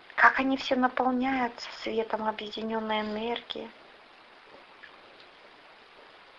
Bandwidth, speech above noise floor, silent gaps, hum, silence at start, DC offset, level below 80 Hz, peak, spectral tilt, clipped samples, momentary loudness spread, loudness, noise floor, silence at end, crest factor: 7.4 kHz; 26 dB; none; none; 0.1 s; under 0.1%; -64 dBFS; -4 dBFS; -4.5 dB/octave; under 0.1%; 24 LU; -28 LUFS; -54 dBFS; 0.2 s; 28 dB